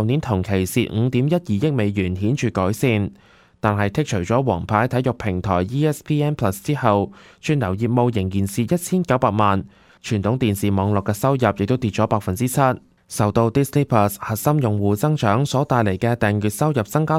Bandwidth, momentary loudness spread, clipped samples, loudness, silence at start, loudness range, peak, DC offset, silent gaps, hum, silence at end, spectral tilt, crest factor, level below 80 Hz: 16 kHz; 4 LU; under 0.1%; -20 LUFS; 0 s; 2 LU; -2 dBFS; under 0.1%; none; none; 0 s; -6.5 dB/octave; 18 dB; -48 dBFS